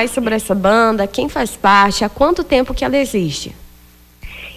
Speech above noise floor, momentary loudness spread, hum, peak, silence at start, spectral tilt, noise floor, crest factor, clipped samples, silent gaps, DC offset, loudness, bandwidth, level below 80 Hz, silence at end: 30 dB; 12 LU; none; -2 dBFS; 0 s; -4.5 dB/octave; -45 dBFS; 14 dB; under 0.1%; none; under 0.1%; -15 LUFS; 16 kHz; -34 dBFS; 0 s